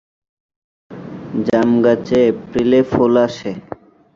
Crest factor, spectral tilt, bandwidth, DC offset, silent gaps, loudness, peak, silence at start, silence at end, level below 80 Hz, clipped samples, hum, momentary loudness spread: 16 dB; -7.5 dB/octave; 7.4 kHz; under 0.1%; none; -15 LUFS; -2 dBFS; 0.9 s; 0.55 s; -48 dBFS; under 0.1%; none; 19 LU